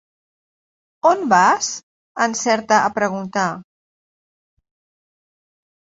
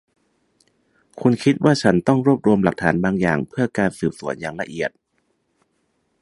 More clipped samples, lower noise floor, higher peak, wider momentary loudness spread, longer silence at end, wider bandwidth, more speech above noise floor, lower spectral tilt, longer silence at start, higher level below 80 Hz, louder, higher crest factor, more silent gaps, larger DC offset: neither; first, under -90 dBFS vs -69 dBFS; about the same, -2 dBFS vs 0 dBFS; about the same, 12 LU vs 11 LU; first, 2.35 s vs 1.35 s; second, 8 kHz vs 11.5 kHz; first, over 73 dB vs 50 dB; second, -3 dB/octave vs -7 dB/octave; about the same, 1.05 s vs 1.15 s; second, -66 dBFS vs -52 dBFS; about the same, -18 LUFS vs -20 LUFS; about the same, 20 dB vs 20 dB; first, 1.83-2.15 s vs none; neither